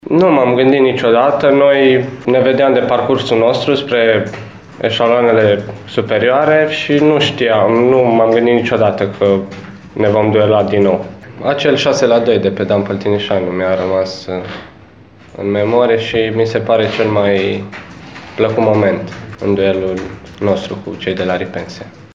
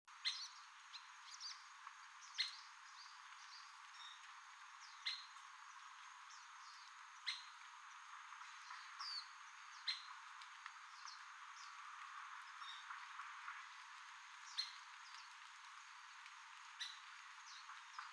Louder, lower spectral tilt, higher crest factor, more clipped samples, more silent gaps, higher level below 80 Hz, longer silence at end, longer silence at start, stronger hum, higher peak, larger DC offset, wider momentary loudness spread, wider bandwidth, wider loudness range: first, -13 LUFS vs -52 LUFS; first, -6.5 dB/octave vs 7.5 dB/octave; second, 12 dB vs 26 dB; neither; neither; first, -50 dBFS vs under -90 dBFS; about the same, 0.1 s vs 0 s; about the same, 0.05 s vs 0.05 s; neither; first, 0 dBFS vs -28 dBFS; first, 0.2% vs under 0.1%; about the same, 13 LU vs 11 LU; second, 7.6 kHz vs 11 kHz; about the same, 5 LU vs 3 LU